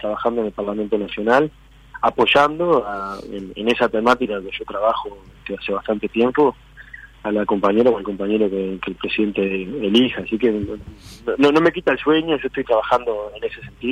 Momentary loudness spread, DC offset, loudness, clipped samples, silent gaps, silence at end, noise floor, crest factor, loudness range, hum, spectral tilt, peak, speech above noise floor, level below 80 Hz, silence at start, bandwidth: 13 LU; under 0.1%; -20 LUFS; under 0.1%; none; 0 s; -41 dBFS; 14 dB; 3 LU; none; -6 dB/octave; -6 dBFS; 21 dB; -48 dBFS; 0 s; 11.5 kHz